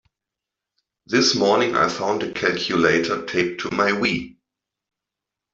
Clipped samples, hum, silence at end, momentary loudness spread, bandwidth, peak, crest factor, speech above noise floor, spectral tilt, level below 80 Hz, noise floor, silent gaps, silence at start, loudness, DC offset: under 0.1%; none; 1.25 s; 6 LU; 7.8 kHz; -4 dBFS; 18 dB; 65 dB; -3.5 dB/octave; -58 dBFS; -86 dBFS; none; 1.1 s; -20 LUFS; under 0.1%